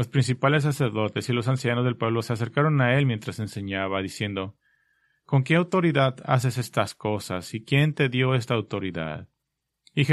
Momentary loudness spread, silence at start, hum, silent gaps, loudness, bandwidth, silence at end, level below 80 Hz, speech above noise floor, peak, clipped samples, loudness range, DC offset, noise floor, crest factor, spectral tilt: 10 LU; 0 s; none; none; -25 LUFS; 12.5 kHz; 0 s; -60 dBFS; 57 dB; -4 dBFS; under 0.1%; 3 LU; under 0.1%; -81 dBFS; 20 dB; -6.5 dB/octave